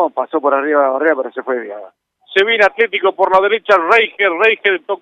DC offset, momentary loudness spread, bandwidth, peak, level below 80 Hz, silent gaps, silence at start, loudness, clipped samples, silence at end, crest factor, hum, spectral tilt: under 0.1%; 10 LU; 8.6 kHz; 0 dBFS; -60 dBFS; none; 0 s; -14 LUFS; under 0.1%; 0.05 s; 14 dB; none; -4 dB/octave